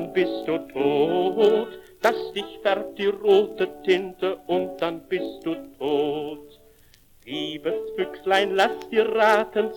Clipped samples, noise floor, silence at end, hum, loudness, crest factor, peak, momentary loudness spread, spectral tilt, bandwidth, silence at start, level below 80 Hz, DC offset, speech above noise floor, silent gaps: under 0.1%; -54 dBFS; 0 s; none; -24 LUFS; 18 dB; -6 dBFS; 11 LU; -5 dB/octave; 18 kHz; 0 s; -60 dBFS; under 0.1%; 31 dB; none